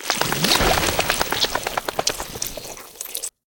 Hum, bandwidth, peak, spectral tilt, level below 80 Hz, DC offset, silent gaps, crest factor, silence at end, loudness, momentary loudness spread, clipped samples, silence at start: none; over 20 kHz; 0 dBFS; -2 dB/octave; -38 dBFS; under 0.1%; none; 22 dB; 0.25 s; -21 LUFS; 13 LU; under 0.1%; 0 s